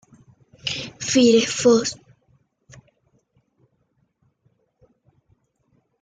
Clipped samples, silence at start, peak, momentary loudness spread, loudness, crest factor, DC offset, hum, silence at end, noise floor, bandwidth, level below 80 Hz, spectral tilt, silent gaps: under 0.1%; 0.65 s; -4 dBFS; 14 LU; -19 LUFS; 20 dB; under 0.1%; none; 4.05 s; -68 dBFS; 9.6 kHz; -62 dBFS; -3.5 dB/octave; none